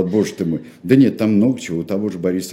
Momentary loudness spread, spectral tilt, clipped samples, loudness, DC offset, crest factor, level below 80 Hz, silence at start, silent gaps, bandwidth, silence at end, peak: 9 LU; -7 dB/octave; under 0.1%; -18 LUFS; under 0.1%; 16 dB; -56 dBFS; 0 s; none; 15 kHz; 0 s; 0 dBFS